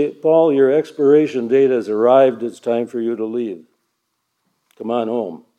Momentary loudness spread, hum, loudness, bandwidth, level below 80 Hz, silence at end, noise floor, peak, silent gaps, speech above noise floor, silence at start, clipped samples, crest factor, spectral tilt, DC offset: 12 LU; none; -16 LUFS; 9 kHz; -80 dBFS; 0.2 s; -72 dBFS; -2 dBFS; none; 56 dB; 0 s; under 0.1%; 16 dB; -7.5 dB/octave; under 0.1%